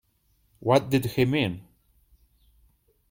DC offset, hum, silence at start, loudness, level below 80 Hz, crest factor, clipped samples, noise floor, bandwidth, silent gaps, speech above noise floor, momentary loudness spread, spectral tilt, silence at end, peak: under 0.1%; none; 0.6 s; -25 LUFS; -58 dBFS; 22 dB; under 0.1%; -68 dBFS; 16.5 kHz; none; 44 dB; 10 LU; -6.5 dB/octave; 1.5 s; -6 dBFS